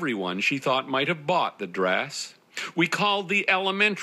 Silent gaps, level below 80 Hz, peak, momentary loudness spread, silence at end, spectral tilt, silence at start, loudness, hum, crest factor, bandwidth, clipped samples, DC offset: none; -82 dBFS; -8 dBFS; 10 LU; 0 s; -4 dB/octave; 0 s; -24 LUFS; none; 18 dB; 14.5 kHz; under 0.1%; under 0.1%